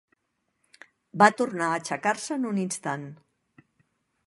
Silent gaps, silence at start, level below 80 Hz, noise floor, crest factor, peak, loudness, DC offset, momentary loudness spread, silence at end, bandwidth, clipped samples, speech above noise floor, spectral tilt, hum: none; 1.15 s; -76 dBFS; -77 dBFS; 26 dB; -2 dBFS; -25 LUFS; under 0.1%; 15 LU; 1.15 s; 11.5 kHz; under 0.1%; 52 dB; -4.5 dB/octave; none